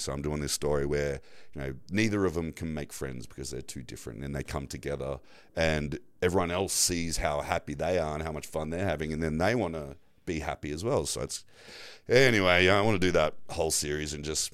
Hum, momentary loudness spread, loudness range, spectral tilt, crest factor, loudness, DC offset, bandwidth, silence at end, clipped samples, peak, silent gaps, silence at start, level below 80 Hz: none; 16 LU; 8 LU; -4 dB/octave; 22 dB; -29 LUFS; under 0.1%; 16 kHz; 0.05 s; under 0.1%; -8 dBFS; none; 0 s; -46 dBFS